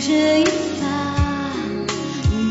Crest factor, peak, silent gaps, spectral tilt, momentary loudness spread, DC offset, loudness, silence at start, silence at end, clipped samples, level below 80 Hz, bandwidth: 12 dB; -6 dBFS; none; -5 dB/octave; 8 LU; under 0.1%; -20 LUFS; 0 s; 0 s; under 0.1%; -32 dBFS; 8 kHz